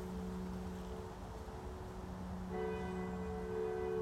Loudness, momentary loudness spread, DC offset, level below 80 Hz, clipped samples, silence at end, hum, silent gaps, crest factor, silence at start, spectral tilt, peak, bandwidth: -44 LUFS; 8 LU; under 0.1%; -52 dBFS; under 0.1%; 0 s; none; none; 14 dB; 0 s; -7 dB/octave; -30 dBFS; 15.5 kHz